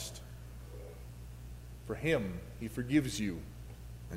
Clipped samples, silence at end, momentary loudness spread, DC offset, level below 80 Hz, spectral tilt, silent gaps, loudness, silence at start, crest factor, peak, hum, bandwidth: under 0.1%; 0 s; 18 LU; under 0.1%; -50 dBFS; -5.5 dB/octave; none; -36 LUFS; 0 s; 22 dB; -16 dBFS; 60 Hz at -50 dBFS; 16 kHz